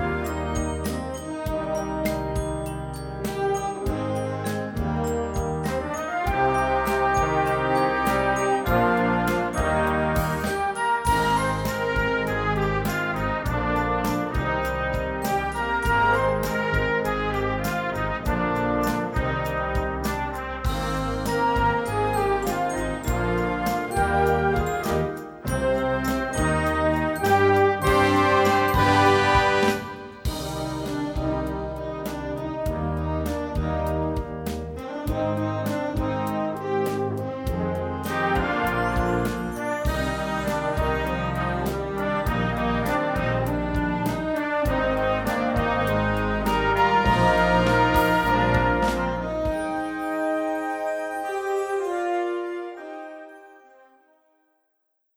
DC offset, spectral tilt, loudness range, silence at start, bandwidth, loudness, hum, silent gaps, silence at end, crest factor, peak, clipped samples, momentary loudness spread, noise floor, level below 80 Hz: under 0.1%; -6 dB/octave; 7 LU; 0 s; over 20 kHz; -24 LUFS; none; none; 1.6 s; 18 dB; -6 dBFS; under 0.1%; 9 LU; -74 dBFS; -36 dBFS